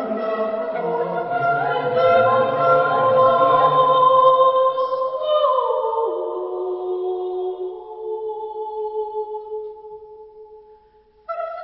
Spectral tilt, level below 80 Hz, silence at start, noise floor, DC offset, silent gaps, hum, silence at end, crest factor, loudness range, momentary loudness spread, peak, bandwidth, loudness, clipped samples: -10 dB/octave; -64 dBFS; 0 s; -54 dBFS; under 0.1%; none; none; 0 s; 16 dB; 15 LU; 16 LU; -4 dBFS; 5.8 kHz; -19 LUFS; under 0.1%